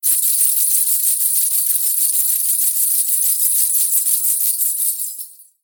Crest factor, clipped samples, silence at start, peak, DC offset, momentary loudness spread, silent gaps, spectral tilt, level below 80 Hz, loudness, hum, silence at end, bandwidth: 16 dB; under 0.1%; 0.05 s; -2 dBFS; under 0.1%; 5 LU; none; 8.5 dB/octave; under -90 dBFS; -13 LUFS; none; 0.2 s; over 20 kHz